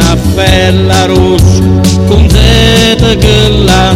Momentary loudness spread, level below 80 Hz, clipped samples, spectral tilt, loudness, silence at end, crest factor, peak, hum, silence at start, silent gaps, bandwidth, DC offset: 3 LU; -12 dBFS; 4%; -5 dB/octave; -6 LUFS; 0 s; 6 dB; 0 dBFS; none; 0 s; none; 16 kHz; under 0.1%